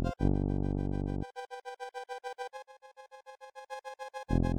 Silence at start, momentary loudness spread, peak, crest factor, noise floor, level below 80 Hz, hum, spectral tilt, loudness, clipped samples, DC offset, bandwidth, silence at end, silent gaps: 0 s; 21 LU; -14 dBFS; 20 dB; -55 dBFS; -40 dBFS; none; -8 dB/octave; -37 LUFS; under 0.1%; under 0.1%; 11 kHz; 0 s; none